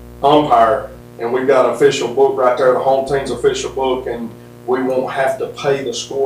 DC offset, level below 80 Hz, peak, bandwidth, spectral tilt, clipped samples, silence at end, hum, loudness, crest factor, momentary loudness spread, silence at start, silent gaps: under 0.1%; -44 dBFS; 0 dBFS; 15.5 kHz; -4.5 dB/octave; under 0.1%; 0 s; 60 Hz at -40 dBFS; -15 LUFS; 16 dB; 10 LU; 0 s; none